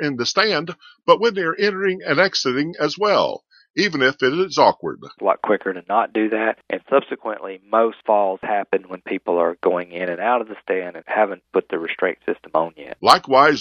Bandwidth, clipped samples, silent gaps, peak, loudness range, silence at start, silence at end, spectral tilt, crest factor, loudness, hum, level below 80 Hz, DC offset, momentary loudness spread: 13.5 kHz; under 0.1%; 3.70-3.74 s; 0 dBFS; 3 LU; 0 s; 0 s; -4 dB/octave; 20 dB; -20 LUFS; none; -64 dBFS; under 0.1%; 10 LU